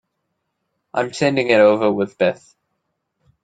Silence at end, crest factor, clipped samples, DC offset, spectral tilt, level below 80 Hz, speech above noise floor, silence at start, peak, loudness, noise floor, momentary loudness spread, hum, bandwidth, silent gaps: 1.1 s; 18 dB; under 0.1%; under 0.1%; -5.5 dB/octave; -62 dBFS; 58 dB; 0.95 s; -2 dBFS; -17 LUFS; -74 dBFS; 11 LU; none; 9.2 kHz; none